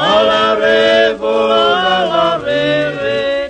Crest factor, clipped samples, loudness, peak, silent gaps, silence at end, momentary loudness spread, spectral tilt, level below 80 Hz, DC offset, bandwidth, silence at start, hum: 12 dB; under 0.1%; -12 LUFS; 0 dBFS; none; 0 s; 5 LU; -4.5 dB/octave; -46 dBFS; under 0.1%; 9.4 kHz; 0 s; none